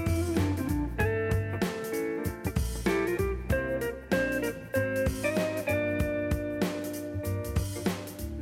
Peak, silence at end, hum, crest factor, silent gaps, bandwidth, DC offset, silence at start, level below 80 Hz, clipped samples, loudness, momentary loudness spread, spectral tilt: -16 dBFS; 0 s; none; 14 dB; none; 16 kHz; under 0.1%; 0 s; -40 dBFS; under 0.1%; -30 LUFS; 5 LU; -6 dB/octave